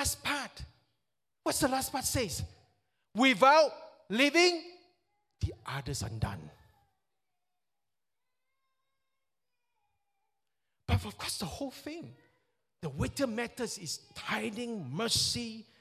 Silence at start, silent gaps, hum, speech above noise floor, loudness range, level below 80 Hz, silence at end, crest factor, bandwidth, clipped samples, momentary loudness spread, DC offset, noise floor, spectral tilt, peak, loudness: 0 s; none; none; over 59 dB; 14 LU; -52 dBFS; 0.2 s; 24 dB; 16 kHz; under 0.1%; 19 LU; under 0.1%; under -90 dBFS; -3.5 dB/octave; -10 dBFS; -31 LUFS